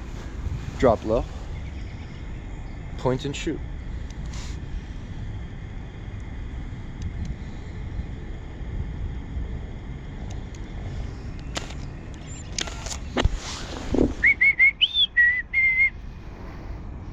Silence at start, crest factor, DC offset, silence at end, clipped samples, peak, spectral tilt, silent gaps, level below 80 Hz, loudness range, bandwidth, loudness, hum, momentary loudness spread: 0 s; 22 dB; under 0.1%; 0 s; under 0.1%; -6 dBFS; -4 dB/octave; none; -34 dBFS; 16 LU; 11 kHz; -24 LUFS; none; 20 LU